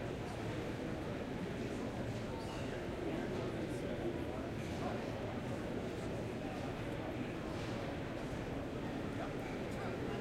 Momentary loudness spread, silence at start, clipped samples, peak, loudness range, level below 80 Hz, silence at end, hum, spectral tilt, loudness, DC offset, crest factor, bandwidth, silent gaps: 2 LU; 0 s; under 0.1%; -28 dBFS; 1 LU; -56 dBFS; 0 s; none; -6.5 dB/octave; -42 LUFS; under 0.1%; 14 dB; 16 kHz; none